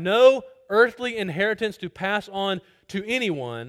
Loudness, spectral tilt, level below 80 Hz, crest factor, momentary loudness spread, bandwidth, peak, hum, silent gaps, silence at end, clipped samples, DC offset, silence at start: -23 LUFS; -5 dB/octave; -64 dBFS; 20 dB; 12 LU; 13 kHz; -4 dBFS; none; none; 0 s; under 0.1%; under 0.1%; 0 s